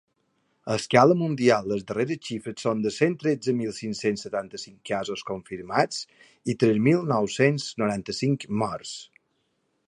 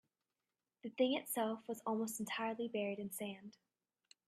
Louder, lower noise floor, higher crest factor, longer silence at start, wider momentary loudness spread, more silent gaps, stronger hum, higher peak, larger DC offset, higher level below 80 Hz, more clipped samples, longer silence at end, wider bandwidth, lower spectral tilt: first, -25 LUFS vs -40 LUFS; second, -73 dBFS vs under -90 dBFS; about the same, 22 dB vs 20 dB; second, 0.65 s vs 0.85 s; about the same, 14 LU vs 14 LU; neither; neither; first, -2 dBFS vs -22 dBFS; neither; first, -64 dBFS vs -86 dBFS; neither; about the same, 0.85 s vs 0.75 s; second, 11.5 kHz vs 15.5 kHz; first, -5.5 dB/octave vs -4 dB/octave